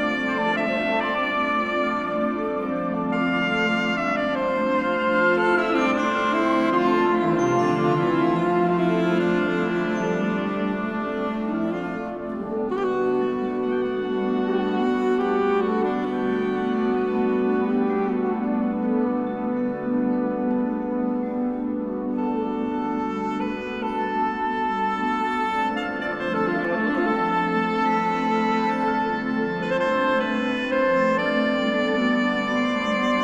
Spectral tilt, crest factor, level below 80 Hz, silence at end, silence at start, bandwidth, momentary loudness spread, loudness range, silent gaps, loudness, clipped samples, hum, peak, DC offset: -6.5 dB/octave; 14 dB; -54 dBFS; 0 s; 0 s; 9.4 kHz; 5 LU; 5 LU; none; -23 LUFS; under 0.1%; none; -8 dBFS; under 0.1%